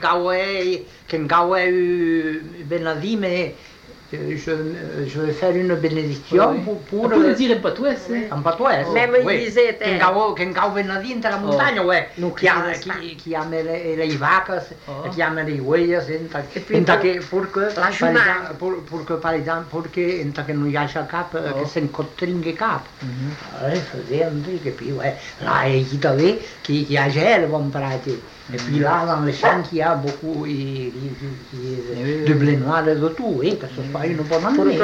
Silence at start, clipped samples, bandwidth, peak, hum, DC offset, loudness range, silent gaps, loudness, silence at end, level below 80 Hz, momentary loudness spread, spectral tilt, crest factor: 0 s; under 0.1%; 9 kHz; -4 dBFS; none; under 0.1%; 6 LU; none; -20 LUFS; 0 s; -52 dBFS; 11 LU; -6.5 dB/octave; 16 dB